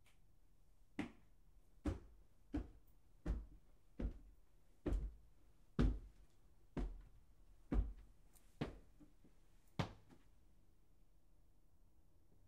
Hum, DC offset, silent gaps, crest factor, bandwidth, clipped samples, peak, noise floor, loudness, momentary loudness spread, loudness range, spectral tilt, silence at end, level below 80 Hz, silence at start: none; under 0.1%; none; 24 dB; 10 kHz; under 0.1%; -24 dBFS; -73 dBFS; -48 LUFS; 21 LU; 7 LU; -7.5 dB/octave; 2.35 s; -52 dBFS; 1 s